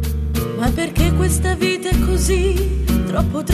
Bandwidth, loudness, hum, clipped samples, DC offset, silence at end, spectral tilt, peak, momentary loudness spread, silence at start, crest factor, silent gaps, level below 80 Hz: 14 kHz; -18 LUFS; none; under 0.1%; under 0.1%; 0 s; -5.5 dB/octave; -4 dBFS; 3 LU; 0 s; 14 dB; none; -20 dBFS